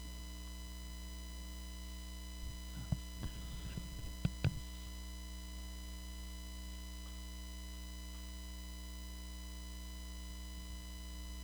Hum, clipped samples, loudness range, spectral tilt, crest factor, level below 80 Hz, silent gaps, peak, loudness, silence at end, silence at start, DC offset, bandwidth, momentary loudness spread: 60 Hz at -50 dBFS; under 0.1%; 5 LU; -4.5 dB/octave; 24 dB; -48 dBFS; none; -20 dBFS; -47 LUFS; 0 s; 0 s; under 0.1%; over 20 kHz; 6 LU